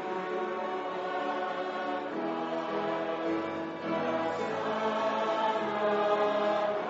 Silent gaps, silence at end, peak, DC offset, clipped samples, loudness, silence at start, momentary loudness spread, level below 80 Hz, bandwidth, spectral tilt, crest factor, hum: none; 0 s; -16 dBFS; under 0.1%; under 0.1%; -31 LUFS; 0 s; 6 LU; -80 dBFS; 7.6 kHz; -3 dB/octave; 16 dB; none